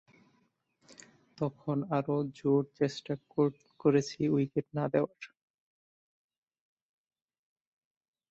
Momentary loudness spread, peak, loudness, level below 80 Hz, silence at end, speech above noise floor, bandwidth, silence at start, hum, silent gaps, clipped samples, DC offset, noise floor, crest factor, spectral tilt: 9 LU; -14 dBFS; -32 LUFS; -72 dBFS; 3.05 s; 43 dB; 8 kHz; 0.9 s; none; none; under 0.1%; under 0.1%; -74 dBFS; 20 dB; -7.5 dB/octave